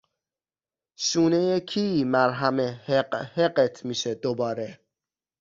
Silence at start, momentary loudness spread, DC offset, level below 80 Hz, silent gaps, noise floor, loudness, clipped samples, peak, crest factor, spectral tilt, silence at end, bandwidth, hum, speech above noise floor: 1 s; 8 LU; under 0.1%; -66 dBFS; none; under -90 dBFS; -25 LUFS; under 0.1%; -6 dBFS; 20 dB; -4.5 dB/octave; 0.65 s; 7.6 kHz; none; over 66 dB